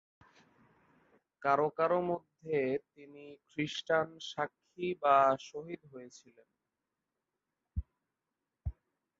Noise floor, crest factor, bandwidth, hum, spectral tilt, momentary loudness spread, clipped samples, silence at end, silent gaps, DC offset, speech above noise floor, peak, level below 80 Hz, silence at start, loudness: -89 dBFS; 22 dB; 7.8 kHz; none; -5.5 dB/octave; 21 LU; under 0.1%; 0.5 s; none; under 0.1%; 55 dB; -14 dBFS; -56 dBFS; 1.4 s; -33 LUFS